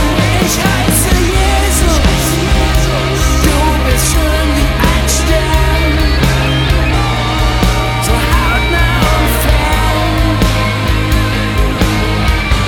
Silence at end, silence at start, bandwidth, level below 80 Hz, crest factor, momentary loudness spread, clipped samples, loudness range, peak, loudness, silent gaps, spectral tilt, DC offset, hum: 0 s; 0 s; 18.5 kHz; -14 dBFS; 10 dB; 2 LU; under 0.1%; 1 LU; 0 dBFS; -12 LUFS; none; -4.5 dB/octave; under 0.1%; none